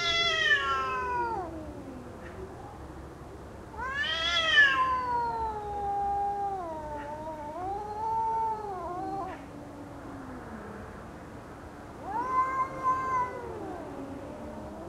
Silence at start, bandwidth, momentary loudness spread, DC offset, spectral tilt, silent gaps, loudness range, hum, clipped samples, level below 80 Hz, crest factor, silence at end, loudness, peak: 0 s; 14.5 kHz; 20 LU; under 0.1%; -3 dB/octave; none; 10 LU; none; under 0.1%; -52 dBFS; 20 dB; 0 s; -29 LUFS; -12 dBFS